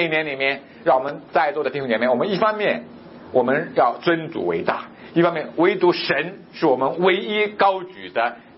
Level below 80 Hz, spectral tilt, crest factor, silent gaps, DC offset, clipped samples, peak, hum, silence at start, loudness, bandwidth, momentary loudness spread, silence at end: -66 dBFS; -9.5 dB/octave; 18 dB; none; under 0.1%; under 0.1%; -4 dBFS; none; 0 s; -21 LUFS; 5.8 kHz; 6 LU; 0.15 s